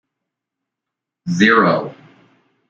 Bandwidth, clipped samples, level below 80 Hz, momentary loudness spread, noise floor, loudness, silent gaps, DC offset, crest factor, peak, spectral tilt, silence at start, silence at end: 7.6 kHz; under 0.1%; -60 dBFS; 21 LU; -83 dBFS; -14 LUFS; none; under 0.1%; 18 dB; -2 dBFS; -5.5 dB/octave; 1.25 s; 0.75 s